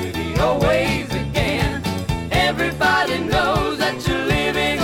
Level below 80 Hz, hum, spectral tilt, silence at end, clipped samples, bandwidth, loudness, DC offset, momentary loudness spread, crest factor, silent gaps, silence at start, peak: -32 dBFS; none; -5 dB/octave; 0 s; under 0.1%; 17.5 kHz; -19 LUFS; under 0.1%; 6 LU; 14 dB; none; 0 s; -6 dBFS